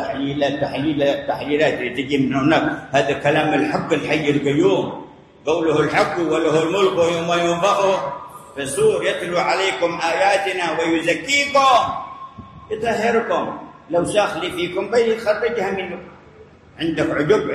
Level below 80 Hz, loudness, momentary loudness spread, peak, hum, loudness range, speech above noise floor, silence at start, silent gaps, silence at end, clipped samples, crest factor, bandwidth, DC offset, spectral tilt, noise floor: -52 dBFS; -19 LUFS; 10 LU; -4 dBFS; none; 3 LU; 27 dB; 0 s; none; 0 s; under 0.1%; 16 dB; 13 kHz; under 0.1%; -4.5 dB/octave; -45 dBFS